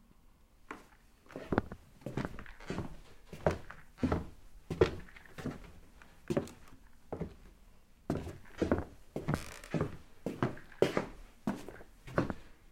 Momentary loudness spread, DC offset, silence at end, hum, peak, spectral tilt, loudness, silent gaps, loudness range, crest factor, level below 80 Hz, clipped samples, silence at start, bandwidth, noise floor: 19 LU; under 0.1%; 0.05 s; none; -8 dBFS; -7 dB/octave; -38 LUFS; none; 6 LU; 30 dB; -54 dBFS; under 0.1%; 0.25 s; 16.5 kHz; -62 dBFS